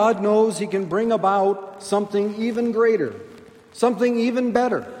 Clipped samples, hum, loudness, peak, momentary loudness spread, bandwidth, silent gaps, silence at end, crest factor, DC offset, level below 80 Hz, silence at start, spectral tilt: under 0.1%; none; -21 LUFS; -6 dBFS; 6 LU; 13 kHz; none; 0 s; 16 dB; under 0.1%; -64 dBFS; 0 s; -5.5 dB/octave